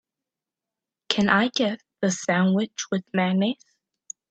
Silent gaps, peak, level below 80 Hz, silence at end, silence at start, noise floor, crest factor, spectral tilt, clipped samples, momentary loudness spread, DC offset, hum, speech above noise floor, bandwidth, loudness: none; -4 dBFS; -68 dBFS; 0.75 s; 1.1 s; -88 dBFS; 22 dB; -4.5 dB/octave; under 0.1%; 9 LU; under 0.1%; none; 66 dB; 8.4 kHz; -24 LUFS